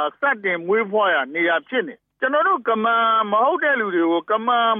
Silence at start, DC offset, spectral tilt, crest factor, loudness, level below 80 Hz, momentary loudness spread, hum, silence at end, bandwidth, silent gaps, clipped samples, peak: 0 s; under 0.1%; -8 dB/octave; 12 dB; -19 LUFS; -80 dBFS; 5 LU; none; 0 s; 3.8 kHz; none; under 0.1%; -8 dBFS